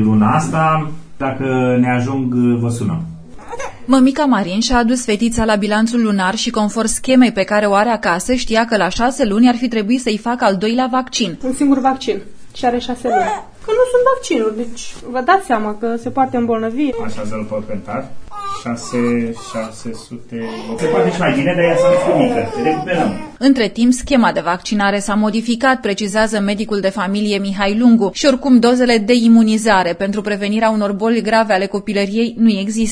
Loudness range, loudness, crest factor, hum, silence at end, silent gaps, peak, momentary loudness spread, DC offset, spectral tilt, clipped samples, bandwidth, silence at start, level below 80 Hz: 6 LU; -15 LUFS; 14 dB; none; 0 s; none; 0 dBFS; 12 LU; under 0.1%; -5 dB/octave; under 0.1%; 11 kHz; 0 s; -40 dBFS